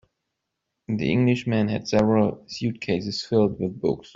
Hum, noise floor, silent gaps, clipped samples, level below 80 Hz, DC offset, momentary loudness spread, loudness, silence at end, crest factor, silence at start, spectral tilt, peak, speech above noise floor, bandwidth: none; -81 dBFS; none; under 0.1%; -54 dBFS; under 0.1%; 8 LU; -24 LUFS; 0.15 s; 18 dB; 0.9 s; -7 dB/octave; -6 dBFS; 58 dB; 7.6 kHz